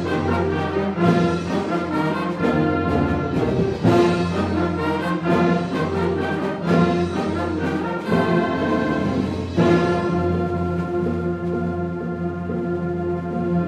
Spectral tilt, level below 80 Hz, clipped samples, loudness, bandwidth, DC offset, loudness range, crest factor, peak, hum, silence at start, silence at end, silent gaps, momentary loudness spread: -7.5 dB/octave; -44 dBFS; under 0.1%; -21 LUFS; 9.8 kHz; under 0.1%; 2 LU; 16 dB; -4 dBFS; none; 0 s; 0 s; none; 6 LU